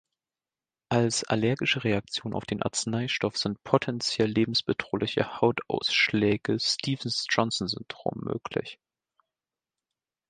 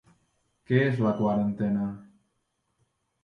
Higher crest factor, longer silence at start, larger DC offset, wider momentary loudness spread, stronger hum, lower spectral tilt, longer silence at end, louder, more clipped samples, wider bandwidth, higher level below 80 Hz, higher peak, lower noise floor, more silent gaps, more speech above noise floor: first, 26 dB vs 18 dB; first, 0.9 s vs 0.7 s; neither; about the same, 8 LU vs 8 LU; neither; second, -4 dB/octave vs -9 dB/octave; first, 1.55 s vs 1.2 s; about the same, -27 LUFS vs -27 LUFS; neither; first, 9.8 kHz vs 6.2 kHz; about the same, -60 dBFS vs -62 dBFS; first, -4 dBFS vs -10 dBFS; first, under -90 dBFS vs -76 dBFS; neither; first, over 62 dB vs 51 dB